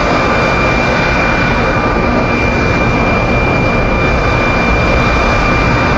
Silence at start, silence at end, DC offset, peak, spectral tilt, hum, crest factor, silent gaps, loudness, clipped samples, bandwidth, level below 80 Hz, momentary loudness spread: 0 s; 0 s; under 0.1%; 0 dBFS; -6 dB/octave; none; 12 dB; none; -11 LUFS; under 0.1%; 8 kHz; -20 dBFS; 1 LU